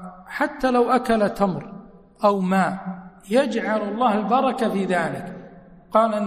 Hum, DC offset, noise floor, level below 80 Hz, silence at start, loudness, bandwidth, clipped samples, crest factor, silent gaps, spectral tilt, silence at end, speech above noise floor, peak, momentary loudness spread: none; under 0.1%; -45 dBFS; -52 dBFS; 0 s; -21 LUFS; 15 kHz; under 0.1%; 18 dB; none; -6.5 dB/octave; 0 s; 24 dB; -4 dBFS; 15 LU